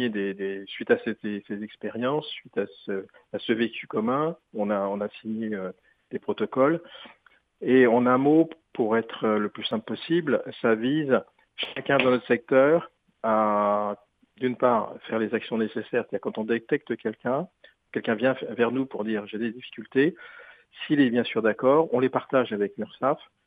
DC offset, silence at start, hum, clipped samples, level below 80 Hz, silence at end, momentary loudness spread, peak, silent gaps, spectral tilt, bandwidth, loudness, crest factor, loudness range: under 0.1%; 0 s; none; under 0.1%; -72 dBFS; 0.3 s; 13 LU; -4 dBFS; none; -8.5 dB/octave; 4.9 kHz; -26 LUFS; 20 dB; 6 LU